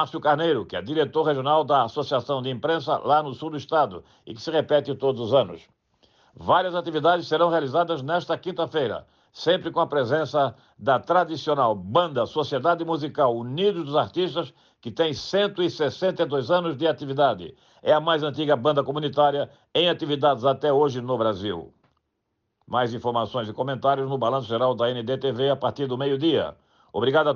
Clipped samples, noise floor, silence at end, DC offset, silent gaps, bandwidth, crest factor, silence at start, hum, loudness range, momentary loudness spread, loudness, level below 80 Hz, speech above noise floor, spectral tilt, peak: under 0.1%; -77 dBFS; 0 s; under 0.1%; none; 7.2 kHz; 16 dB; 0 s; none; 2 LU; 8 LU; -24 LUFS; -66 dBFS; 53 dB; -6.5 dB/octave; -8 dBFS